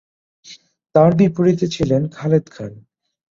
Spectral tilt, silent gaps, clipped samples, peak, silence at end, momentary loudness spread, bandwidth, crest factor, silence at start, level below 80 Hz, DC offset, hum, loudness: -8 dB/octave; none; under 0.1%; -2 dBFS; 0.55 s; 19 LU; 7.6 kHz; 16 dB; 0.5 s; -48 dBFS; under 0.1%; none; -17 LUFS